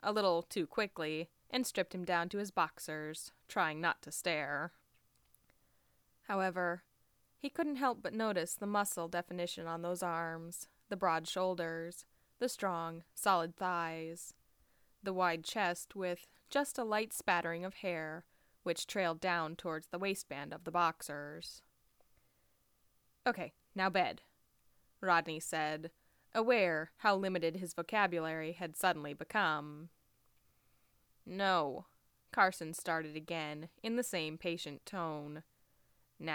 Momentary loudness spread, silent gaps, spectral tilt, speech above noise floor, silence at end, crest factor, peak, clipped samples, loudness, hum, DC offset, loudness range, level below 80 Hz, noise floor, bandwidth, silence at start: 13 LU; none; -3.5 dB/octave; 39 dB; 0 s; 24 dB; -16 dBFS; under 0.1%; -37 LUFS; none; under 0.1%; 5 LU; -76 dBFS; -76 dBFS; over 20 kHz; 0 s